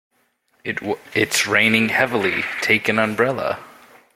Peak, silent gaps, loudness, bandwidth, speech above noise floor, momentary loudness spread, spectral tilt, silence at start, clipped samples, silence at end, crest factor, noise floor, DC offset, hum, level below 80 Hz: 0 dBFS; none; -18 LUFS; 16.5 kHz; 45 dB; 11 LU; -3.5 dB/octave; 0.65 s; under 0.1%; 0.45 s; 20 dB; -64 dBFS; under 0.1%; none; -60 dBFS